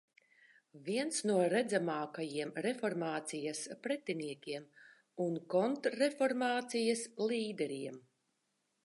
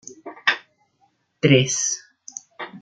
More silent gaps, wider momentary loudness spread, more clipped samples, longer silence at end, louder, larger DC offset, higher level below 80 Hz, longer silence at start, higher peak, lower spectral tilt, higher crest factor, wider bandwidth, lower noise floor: neither; second, 11 LU vs 21 LU; neither; first, 0.85 s vs 0 s; second, -36 LUFS vs -20 LUFS; neither; second, under -90 dBFS vs -66 dBFS; first, 0.75 s vs 0.05 s; second, -20 dBFS vs -2 dBFS; about the same, -4 dB/octave vs -3.5 dB/octave; about the same, 18 dB vs 22 dB; first, 11.5 kHz vs 9.4 kHz; first, -82 dBFS vs -65 dBFS